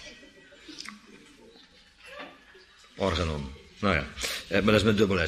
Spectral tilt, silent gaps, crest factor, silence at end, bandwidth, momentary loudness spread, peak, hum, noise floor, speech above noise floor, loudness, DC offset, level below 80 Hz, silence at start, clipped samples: -5 dB/octave; none; 22 dB; 0 s; 15 kHz; 25 LU; -8 dBFS; none; -56 dBFS; 30 dB; -27 LUFS; under 0.1%; -46 dBFS; 0 s; under 0.1%